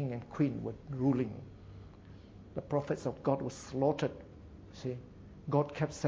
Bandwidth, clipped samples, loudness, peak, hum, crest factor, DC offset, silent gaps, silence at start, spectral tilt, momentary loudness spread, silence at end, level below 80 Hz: 8 kHz; under 0.1%; -35 LUFS; -16 dBFS; none; 20 dB; under 0.1%; none; 0 s; -7.5 dB/octave; 21 LU; 0 s; -58 dBFS